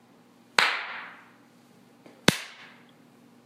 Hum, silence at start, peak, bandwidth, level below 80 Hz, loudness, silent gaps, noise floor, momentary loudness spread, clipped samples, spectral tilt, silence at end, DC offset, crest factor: none; 0.6 s; 0 dBFS; 16 kHz; -62 dBFS; -26 LUFS; none; -57 dBFS; 23 LU; under 0.1%; -2.5 dB/octave; 0.75 s; under 0.1%; 32 dB